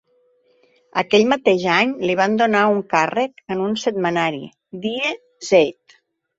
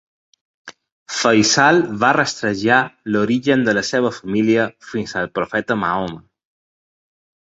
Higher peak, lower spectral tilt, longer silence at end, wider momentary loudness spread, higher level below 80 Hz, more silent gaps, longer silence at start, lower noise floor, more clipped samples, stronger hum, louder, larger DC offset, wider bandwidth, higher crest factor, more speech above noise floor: about the same, -2 dBFS vs -2 dBFS; about the same, -4.5 dB/octave vs -4 dB/octave; second, 0.65 s vs 1.35 s; about the same, 10 LU vs 10 LU; second, -62 dBFS vs -56 dBFS; second, none vs 0.92-1.06 s; first, 0.95 s vs 0.65 s; second, -60 dBFS vs under -90 dBFS; neither; neither; about the same, -19 LUFS vs -17 LUFS; neither; about the same, 8 kHz vs 8 kHz; about the same, 18 dB vs 18 dB; second, 42 dB vs over 73 dB